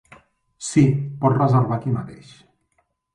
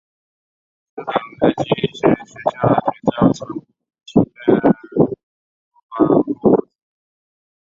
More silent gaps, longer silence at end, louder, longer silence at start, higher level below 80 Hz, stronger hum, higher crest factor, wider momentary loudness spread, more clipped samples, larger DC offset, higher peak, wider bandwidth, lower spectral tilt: second, none vs 5.23-5.71 s, 5.83-5.89 s; about the same, 1 s vs 1.05 s; second, -20 LUFS vs -17 LUFS; second, 0.6 s vs 0.95 s; second, -56 dBFS vs -50 dBFS; neither; about the same, 18 dB vs 18 dB; about the same, 12 LU vs 14 LU; neither; neither; second, -4 dBFS vs 0 dBFS; first, 10.5 kHz vs 7.6 kHz; about the same, -7.5 dB/octave vs -8 dB/octave